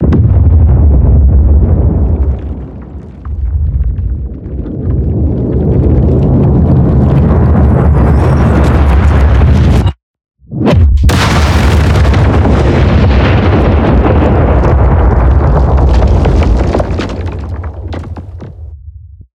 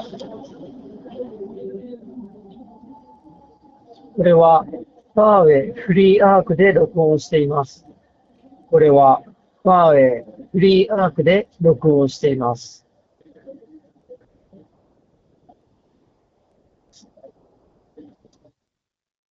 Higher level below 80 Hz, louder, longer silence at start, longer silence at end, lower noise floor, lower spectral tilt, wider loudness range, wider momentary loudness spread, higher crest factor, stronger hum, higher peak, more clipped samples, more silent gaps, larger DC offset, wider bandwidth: first, -12 dBFS vs -54 dBFS; first, -9 LUFS vs -15 LUFS; about the same, 0 s vs 0 s; second, 0.3 s vs 5.8 s; second, -30 dBFS vs -83 dBFS; about the same, -8 dB/octave vs -7.5 dB/octave; second, 6 LU vs 20 LU; second, 14 LU vs 24 LU; second, 8 dB vs 18 dB; neither; about the same, 0 dBFS vs 0 dBFS; neither; first, 10.03-10.14 s vs none; neither; first, 9.6 kHz vs 7.6 kHz